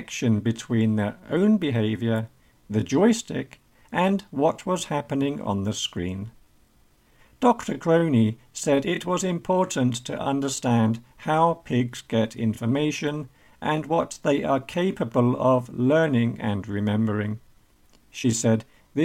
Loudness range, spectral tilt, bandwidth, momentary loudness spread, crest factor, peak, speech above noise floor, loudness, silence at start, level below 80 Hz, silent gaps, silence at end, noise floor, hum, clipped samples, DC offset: 3 LU; -6 dB/octave; 15 kHz; 9 LU; 18 dB; -6 dBFS; 36 dB; -24 LUFS; 0 s; -58 dBFS; none; 0 s; -59 dBFS; none; under 0.1%; under 0.1%